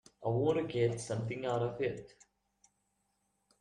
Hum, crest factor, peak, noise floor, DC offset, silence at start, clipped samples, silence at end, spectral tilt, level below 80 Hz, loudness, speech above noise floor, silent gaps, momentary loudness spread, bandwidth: none; 18 dB; -18 dBFS; -80 dBFS; under 0.1%; 0.2 s; under 0.1%; 1.55 s; -6.5 dB/octave; -68 dBFS; -35 LUFS; 46 dB; none; 6 LU; 11 kHz